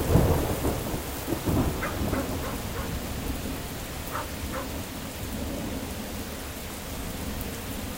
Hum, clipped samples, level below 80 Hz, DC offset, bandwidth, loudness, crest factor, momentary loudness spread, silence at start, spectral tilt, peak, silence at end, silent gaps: none; under 0.1%; -36 dBFS; 0.1%; 16.5 kHz; -31 LUFS; 22 dB; 8 LU; 0 s; -5 dB/octave; -6 dBFS; 0 s; none